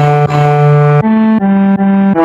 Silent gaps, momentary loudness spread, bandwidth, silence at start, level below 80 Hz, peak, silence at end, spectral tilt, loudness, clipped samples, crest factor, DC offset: none; 2 LU; 7.6 kHz; 0 s; -46 dBFS; 0 dBFS; 0 s; -9.5 dB/octave; -9 LUFS; 0.2%; 8 dB; under 0.1%